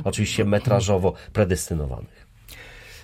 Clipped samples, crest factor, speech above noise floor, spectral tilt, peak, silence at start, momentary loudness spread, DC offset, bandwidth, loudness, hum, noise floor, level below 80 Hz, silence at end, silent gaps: under 0.1%; 18 dB; 22 dB; -5.5 dB/octave; -6 dBFS; 0 s; 22 LU; under 0.1%; 16 kHz; -23 LUFS; none; -44 dBFS; -40 dBFS; 0 s; none